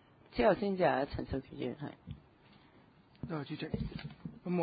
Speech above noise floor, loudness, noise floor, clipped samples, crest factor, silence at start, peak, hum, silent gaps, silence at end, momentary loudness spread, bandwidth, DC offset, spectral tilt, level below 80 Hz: 28 dB; -36 LUFS; -63 dBFS; under 0.1%; 20 dB; 0.3 s; -16 dBFS; none; none; 0 s; 18 LU; 4.9 kHz; under 0.1%; -5.5 dB/octave; -54 dBFS